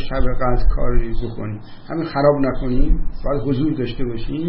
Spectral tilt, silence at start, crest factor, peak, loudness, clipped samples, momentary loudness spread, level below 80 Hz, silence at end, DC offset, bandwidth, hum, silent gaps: -12.5 dB/octave; 0 s; 14 dB; -2 dBFS; -22 LUFS; under 0.1%; 11 LU; -20 dBFS; 0 s; under 0.1%; 5.4 kHz; none; none